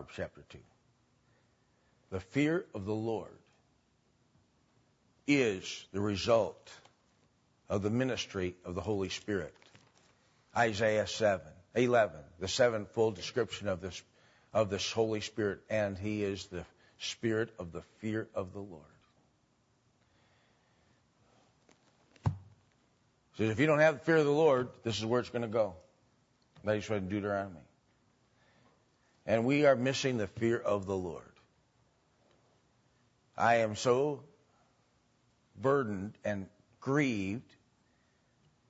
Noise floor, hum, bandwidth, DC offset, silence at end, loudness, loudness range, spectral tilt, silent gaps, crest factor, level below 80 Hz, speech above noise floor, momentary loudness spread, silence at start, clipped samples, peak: -73 dBFS; none; 8 kHz; under 0.1%; 1.3 s; -33 LUFS; 9 LU; -5.5 dB/octave; none; 22 dB; -66 dBFS; 40 dB; 15 LU; 0 s; under 0.1%; -14 dBFS